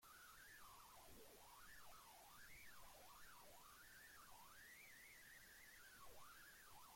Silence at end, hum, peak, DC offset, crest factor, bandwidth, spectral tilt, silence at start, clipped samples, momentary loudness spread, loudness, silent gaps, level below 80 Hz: 0 s; none; -50 dBFS; under 0.1%; 14 dB; 16.5 kHz; -1.5 dB/octave; 0 s; under 0.1%; 2 LU; -63 LUFS; none; -78 dBFS